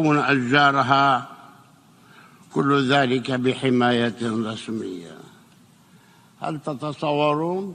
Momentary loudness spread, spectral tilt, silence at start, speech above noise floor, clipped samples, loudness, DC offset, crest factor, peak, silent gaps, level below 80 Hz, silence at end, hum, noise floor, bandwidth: 14 LU; -6 dB/octave; 0 s; 32 dB; under 0.1%; -21 LUFS; under 0.1%; 20 dB; -2 dBFS; none; -64 dBFS; 0 s; none; -53 dBFS; 10.5 kHz